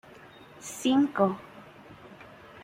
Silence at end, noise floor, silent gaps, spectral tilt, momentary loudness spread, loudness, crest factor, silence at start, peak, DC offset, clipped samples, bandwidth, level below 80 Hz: 0 s; -51 dBFS; none; -5 dB/octave; 25 LU; -26 LUFS; 20 dB; 0.6 s; -10 dBFS; under 0.1%; under 0.1%; 16 kHz; -68 dBFS